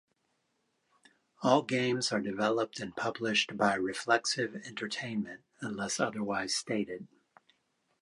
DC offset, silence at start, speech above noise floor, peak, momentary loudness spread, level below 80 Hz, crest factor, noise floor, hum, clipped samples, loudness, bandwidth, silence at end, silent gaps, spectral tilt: under 0.1%; 1.4 s; 46 dB; -10 dBFS; 10 LU; -74 dBFS; 24 dB; -78 dBFS; none; under 0.1%; -32 LUFS; 11.5 kHz; 0.95 s; none; -3.5 dB/octave